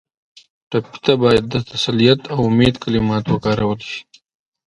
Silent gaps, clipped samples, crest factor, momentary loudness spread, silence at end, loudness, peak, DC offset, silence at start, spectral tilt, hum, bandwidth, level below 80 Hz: none; under 0.1%; 18 dB; 9 LU; 0.65 s; -17 LUFS; 0 dBFS; under 0.1%; 0.7 s; -6.5 dB/octave; none; 11 kHz; -42 dBFS